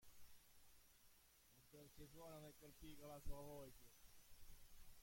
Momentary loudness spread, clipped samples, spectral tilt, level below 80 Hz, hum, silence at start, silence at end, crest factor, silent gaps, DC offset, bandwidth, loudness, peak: 11 LU; under 0.1%; -4.5 dB/octave; -66 dBFS; none; 0 s; 0 s; 22 dB; none; under 0.1%; 16.5 kHz; -63 LUFS; -38 dBFS